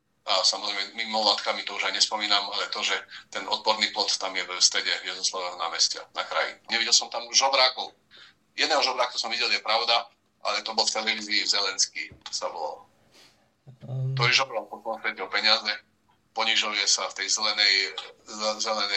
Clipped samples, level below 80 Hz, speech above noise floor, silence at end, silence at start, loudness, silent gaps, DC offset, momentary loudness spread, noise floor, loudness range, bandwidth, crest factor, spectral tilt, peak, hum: under 0.1%; -76 dBFS; 32 dB; 0 s; 0.25 s; -24 LUFS; none; under 0.1%; 12 LU; -59 dBFS; 4 LU; 12.5 kHz; 24 dB; -1 dB/octave; -4 dBFS; none